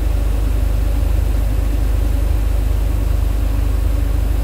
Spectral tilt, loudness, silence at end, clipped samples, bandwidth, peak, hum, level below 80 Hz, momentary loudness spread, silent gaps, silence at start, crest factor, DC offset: -7 dB/octave; -19 LUFS; 0 s; under 0.1%; 16 kHz; -6 dBFS; none; -16 dBFS; 1 LU; none; 0 s; 10 dB; under 0.1%